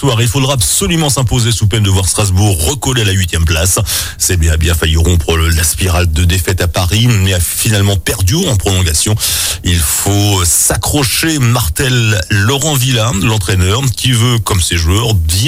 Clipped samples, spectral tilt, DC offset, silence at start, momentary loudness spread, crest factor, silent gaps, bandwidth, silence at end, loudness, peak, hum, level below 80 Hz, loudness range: under 0.1%; -3.5 dB/octave; under 0.1%; 0 s; 2 LU; 10 dB; none; 16.5 kHz; 0 s; -11 LUFS; 0 dBFS; none; -22 dBFS; 1 LU